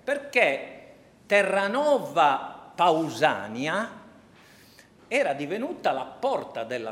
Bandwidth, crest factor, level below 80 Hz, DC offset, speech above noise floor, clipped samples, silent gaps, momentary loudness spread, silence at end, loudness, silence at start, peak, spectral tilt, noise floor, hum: 16 kHz; 20 dB; -72 dBFS; under 0.1%; 29 dB; under 0.1%; none; 10 LU; 0 s; -25 LUFS; 0.05 s; -6 dBFS; -4 dB/octave; -54 dBFS; none